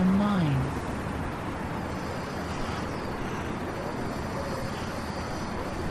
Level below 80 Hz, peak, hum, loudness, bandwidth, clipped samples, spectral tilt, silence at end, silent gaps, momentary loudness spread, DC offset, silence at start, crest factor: -42 dBFS; -14 dBFS; none; -31 LUFS; 13.5 kHz; under 0.1%; -6.5 dB/octave; 0 s; none; 8 LU; under 0.1%; 0 s; 16 dB